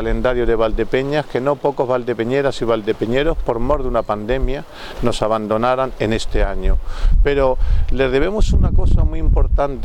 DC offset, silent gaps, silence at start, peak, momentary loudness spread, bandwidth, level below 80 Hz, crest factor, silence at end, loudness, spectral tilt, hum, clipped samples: under 0.1%; none; 0 s; -2 dBFS; 5 LU; 9.6 kHz; -18 dBFS; 14 dB; 0 s; -19 LUFS; -7 dB/octave; none; under 0.1%